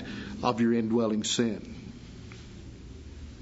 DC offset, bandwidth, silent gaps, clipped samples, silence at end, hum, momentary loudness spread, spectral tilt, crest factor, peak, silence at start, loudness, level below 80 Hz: under 0.1%; 8 kHz; none; under 0.1%; 0 s; none; 20 LU; -4.5 dB/octave; 20 dB; -10 dBFS; 0 s; -28 LUFS; -50 dBFS